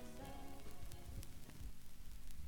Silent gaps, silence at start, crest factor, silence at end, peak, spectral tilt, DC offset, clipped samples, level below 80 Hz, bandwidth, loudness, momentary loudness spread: none; 0 s; 16 dB; 0 s; -30 dBFS; -5 dB/octave; under 0.1%; under 0.1%; -54 dBFS; 18 kHz; -56 LUFS; 5 LU